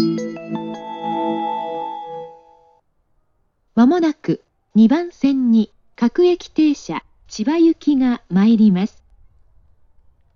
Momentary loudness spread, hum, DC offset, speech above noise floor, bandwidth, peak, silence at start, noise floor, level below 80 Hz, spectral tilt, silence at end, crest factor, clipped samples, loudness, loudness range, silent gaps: 14 LU; none; under 0.1%; 48 dB; 7.2 kHz; -4 dBFS; 0 s; -64 dBFS; -56 dBFS; -7 dB/octave; 1.5 s; 14 dB; under 0.1%; -18 LUFS; 9 LU; none